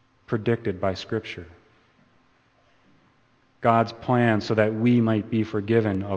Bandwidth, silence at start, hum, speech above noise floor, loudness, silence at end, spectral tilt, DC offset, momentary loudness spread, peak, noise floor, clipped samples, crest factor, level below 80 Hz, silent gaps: 7.8 kHz; 0.3 s; none; 39 dB; -24 LUFS; 0 s; -8 dB/octave; under 0.1%; 10 LU; -4 dBFS; -62 dBFS; under 0.1%; 22 dB; -60 dBFS; none